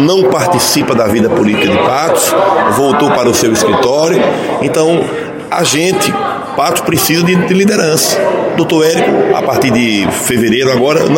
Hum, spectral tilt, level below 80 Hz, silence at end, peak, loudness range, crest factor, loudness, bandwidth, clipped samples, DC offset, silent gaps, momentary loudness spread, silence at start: none; -4 dB/octave; -46 dBFS; 0 s; 0 dBFS; 2 LU; 10 dB; -10 LUFS; 17 kHz; under 0.1%; under 0.1%; none; 4 LU; 0 s